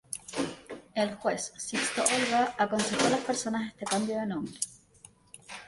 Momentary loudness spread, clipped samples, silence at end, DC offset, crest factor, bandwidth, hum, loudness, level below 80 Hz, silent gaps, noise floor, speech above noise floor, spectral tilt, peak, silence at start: 10 LU; under 0.1%; 0 s; under 0.1%; 24 dB; 12 kHz; none; -30 LUFS; -66 dBFS; none; -57 dBFS; 28 dB; -3 dB/octave; -6 dBFS; 0.1 s